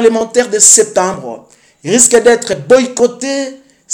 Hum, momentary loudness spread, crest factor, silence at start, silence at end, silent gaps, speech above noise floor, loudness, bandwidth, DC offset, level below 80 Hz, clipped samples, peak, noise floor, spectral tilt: none; 19 LU; 12 dB; 0 s; 0 s; none; 29 dB; -9 LUFS; over 20 kHz; under 0.1%; -52 dBFS; 0.9%; 0 dBFS; -39 dBFS; -2 dB/octave